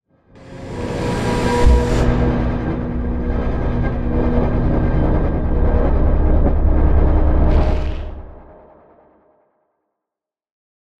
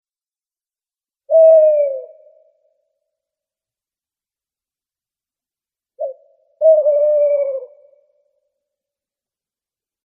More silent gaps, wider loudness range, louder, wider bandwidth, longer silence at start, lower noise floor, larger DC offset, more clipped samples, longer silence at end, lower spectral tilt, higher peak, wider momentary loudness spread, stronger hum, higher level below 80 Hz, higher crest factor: neither; second, 6 LU vs 20 LU; second, -18 LUFS vs -13 LUFS; first, 10 kHz vs 2.6 kHz; second, 0.35 s vs 1.3 s; second, -86 dBFS vs under -90 dBFS; neither; neither; about the same, 2.35 s vs 2.4 s; first, -8 dB/octave vs -5.5 dB/octave; about the same, -2 dBFS vs -2 dBFS; second, 9 LU vs 19 LU; neither; first, -18 dBFS vs under -90 dBFS; about the same, 14 dB vs 16 dB